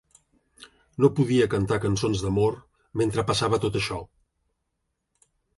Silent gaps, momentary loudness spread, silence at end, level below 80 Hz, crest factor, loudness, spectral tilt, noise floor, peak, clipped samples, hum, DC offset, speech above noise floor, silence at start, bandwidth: none; 12 LU; 1.55 s; -48 dBFS; 20 dB; -24 LUFS; -6 dB/octave; -79 dBFS; -6 dBFS; under 0.1%; none; under 0.1%; 55 dB; 0.6 s; 11.5 kHz